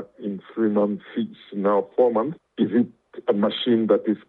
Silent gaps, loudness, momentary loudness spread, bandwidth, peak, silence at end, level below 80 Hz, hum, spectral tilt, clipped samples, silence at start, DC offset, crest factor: none; -23 LUFS; 10 LU; 4.3 kHz; -4 dBFS; 0.1 s; -74 dBFS; none; -9.5 dB/octave; under 0.1%; 0 s; under 0.1%; 18 dB